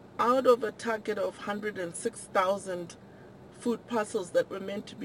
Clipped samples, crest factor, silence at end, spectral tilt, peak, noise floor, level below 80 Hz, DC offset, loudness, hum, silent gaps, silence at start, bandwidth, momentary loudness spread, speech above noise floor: under 0.1%; 20 dB; 0 s; -4.5 dB/octave; -10 dBFS; -50 dBFS; -68 dBFS; under 0.1%; -30 LUFS; none; none; 0 s; 16 kHz; 13 LU; 20 dB